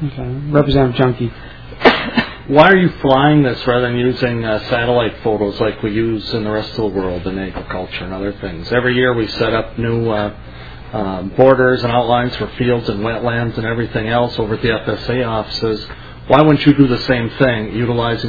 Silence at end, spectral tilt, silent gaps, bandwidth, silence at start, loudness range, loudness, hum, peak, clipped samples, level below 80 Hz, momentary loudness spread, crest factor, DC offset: 0 s; -8 dB/octave; none; 5.4 kHz; 0 s; 6 LU; -15 LUFS; none; 0 dBFS; 0.2%; -36 dBFS; 13 LU; 16 dB; 0.7%